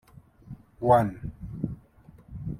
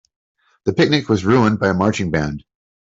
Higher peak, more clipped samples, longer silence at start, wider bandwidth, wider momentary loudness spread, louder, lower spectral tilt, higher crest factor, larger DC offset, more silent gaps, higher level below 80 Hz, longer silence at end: second, -6 dBFS vs -2 dBFS; neither; second, 0.45 s vs 0.65 s; first, 15.5 kHz vs 8 kHz; first, 26 LU vs 11 LU; second, -26 LUFS vs -17 LUFS; first, -9 dB/octave vs -6.5 dB/octave; first, 22 dB vs 16 dB; neither; neither; about the same, -48 dBFS vs -46 dBFS; second, 0 s vs 0.6 s